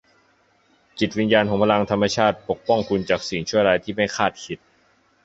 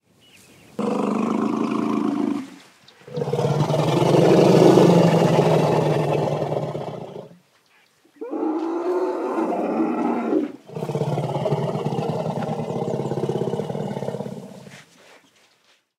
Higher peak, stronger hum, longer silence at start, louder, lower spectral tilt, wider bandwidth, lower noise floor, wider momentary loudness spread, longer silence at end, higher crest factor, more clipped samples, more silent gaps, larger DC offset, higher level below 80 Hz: about the same, -2 dBFS vs 0 dBFS; neither; first, 0.95 s vs 0.8 s; about the same, -21 LUFS vs -21 LUFS; second, -5 dB/octave vs -7.5 dB/octave; second, 8 kHz vs 15 kHz; about the same, -61 dBFS vs -61 dBFS; second, 9 LU vs 17 LU; second, 0.7 s vs 1.2 s; about the same, 20 dB vs 22 dB; neither; neither; neither; first, -52 dBFS vs -62 dBFS